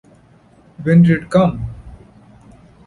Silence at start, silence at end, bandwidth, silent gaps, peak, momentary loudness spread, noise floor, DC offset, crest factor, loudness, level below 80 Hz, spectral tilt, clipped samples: 0.8 s; 0.9 s; 10.5 kHz; none; -2 dBFS; 18 LU; -49 dBFS; under 0.1%; 16 dB; -14 LUFS; -42 dBFS; -9 dB/octave; under 0.1%